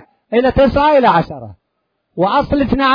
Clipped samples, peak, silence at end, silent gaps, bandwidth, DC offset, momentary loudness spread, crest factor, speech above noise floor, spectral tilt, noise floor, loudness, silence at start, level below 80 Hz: under 0.1%; 0 dBFS; 0 s; none; 5.2 kHz; under 0.1%; 15 LU; 14 dB; 57 dB; -8 dB/octave; -70 dBFS; -13 LUFS; 0.3 s; -34 dBFS